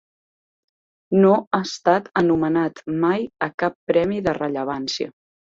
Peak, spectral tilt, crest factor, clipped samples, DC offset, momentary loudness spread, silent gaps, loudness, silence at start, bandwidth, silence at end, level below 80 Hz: -4 dBFS; -6 dB/octave; 18 dB; under 0.1%; under 0.1%; 9 LU; 1.47-1.51 s, 3.54-3.58 s, 3.75-3.87 s; -21 LUFS; 1.1 s; 7.8 kHz; 0.4 s; -58 dBFS